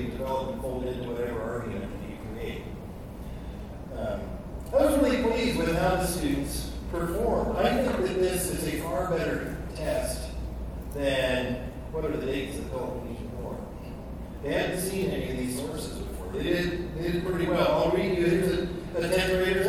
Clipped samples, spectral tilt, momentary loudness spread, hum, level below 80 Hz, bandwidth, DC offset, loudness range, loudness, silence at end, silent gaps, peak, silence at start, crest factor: under 0.1%; -5.5 dB/octave; 14 LU; none; -40 dBFS; 18.5 kHz; under 0.1%; 7 LU; -29 LUFS; 0 s; none; -10 dBFS; 0 s; 18 dB